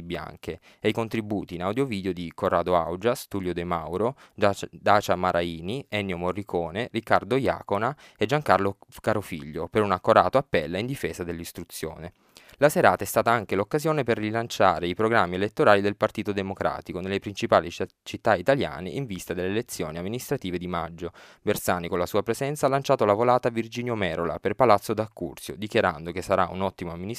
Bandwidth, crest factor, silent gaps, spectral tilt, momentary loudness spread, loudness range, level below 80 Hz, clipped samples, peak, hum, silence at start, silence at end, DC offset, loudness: 15.5 kHz; 24 dB; none; -5.5 dB/octave; 13 LU; 4 LU; -54 dBFS; under 0.1%; -2 dBFS; none; 0 s; 0 s; under 0.1%; -26 LUFS